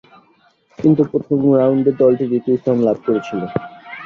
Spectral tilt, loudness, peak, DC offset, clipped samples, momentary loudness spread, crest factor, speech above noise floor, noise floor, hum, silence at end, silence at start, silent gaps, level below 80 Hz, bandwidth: -9.5 dB/octave; -16 LUFS; -2 dBFS; under 0.1%; under 0.1%; 10 LU; 16 dB; 40 dB; -56 dBFS; none; 0 s; 0.8 s; none; -56 dBFS; 6.6 kHz